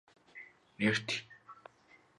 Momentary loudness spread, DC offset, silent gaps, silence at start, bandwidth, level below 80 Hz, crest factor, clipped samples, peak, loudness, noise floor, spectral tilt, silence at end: 23 LU; under 0.1%; none; 0.35 s; 11 kHz; -76 dBFS; 24 dB; under 0.1%; -16 dBFS; -34 LUFS; -65 dBFS; -4 dB/octave; 0.65 s